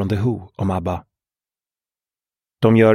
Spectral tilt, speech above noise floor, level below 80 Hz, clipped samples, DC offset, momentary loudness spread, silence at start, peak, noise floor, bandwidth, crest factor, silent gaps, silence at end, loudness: -8.5 dB/octave; over 73 dB; -48 dBFS; under 0.1%; under 0.1%; 11 LU; 0 s; -2 dBFS; under -90 dBFS; 11.5 kHz; 18 dB; none; 0 s; -21 LUFS